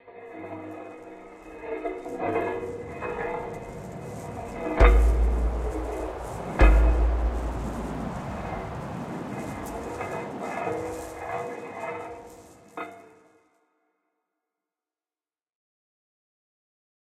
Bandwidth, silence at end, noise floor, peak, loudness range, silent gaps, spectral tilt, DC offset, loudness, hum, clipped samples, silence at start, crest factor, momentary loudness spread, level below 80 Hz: 9.8 kHz; 4.1 s; under -90 dBFS; -4 dBFS; 17 LU; none; -7 dB/octave; under 0.1%; -29 LUFS; none; under 0.1%; 0.05 s; 24 dB; 19 LU; -30 dBFS